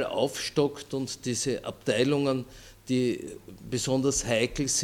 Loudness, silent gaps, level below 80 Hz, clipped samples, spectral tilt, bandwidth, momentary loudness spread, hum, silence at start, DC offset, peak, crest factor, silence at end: -28 LUFS; none; -52 dBFS; under 0.1%; -4 dB/octave; 18 kHz; 10 LU; none; 0 s; under 0.1%; -10 dBFS; 18 dB; 0 s